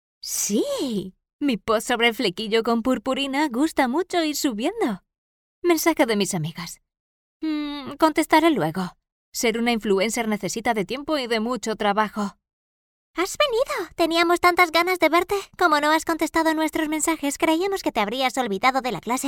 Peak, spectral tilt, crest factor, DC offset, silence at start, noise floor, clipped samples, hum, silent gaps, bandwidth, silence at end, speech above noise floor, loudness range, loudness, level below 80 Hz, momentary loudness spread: -4 dBFS; -3.5 dB/octave; 20 dB; under 0.1%; 0.25 s; under -90 dBFS; under 0.1%; none; 1.33-1.39 s, 5.18-5.62 s, 7.00-7.40 s, 9.12-9.32 s, 12.53-13.14 s; 19 kHz; 0 s; over 68 dB; 5 LU; -22 LUFS; -54 dBFS; 10 LU